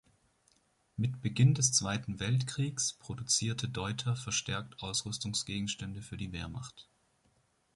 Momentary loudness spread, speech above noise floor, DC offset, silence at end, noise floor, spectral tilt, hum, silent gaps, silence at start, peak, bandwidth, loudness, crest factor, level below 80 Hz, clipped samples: 14 LU; 39 dB; under 0.1%; 0.95 s; -72 dBFS; -3.5 dB/octave; none; none; 0.95 s; -14 dBFS; 11.5 kHz; -33 LUFS; 22 dB; -58 dBFS; under 0.1%